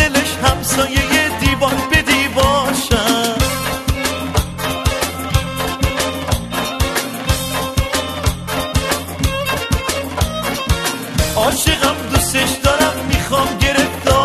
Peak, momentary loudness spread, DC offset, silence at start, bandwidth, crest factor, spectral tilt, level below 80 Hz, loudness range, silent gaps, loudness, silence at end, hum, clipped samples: 0 dBFS; 6 LU; under 0.1%; 0 s; 13.5 kHz; 16 dB; -3.5 dB/octave; -26 dBFS; 4 LU; none; -16 LUFS; 0 s; none; under 0.1%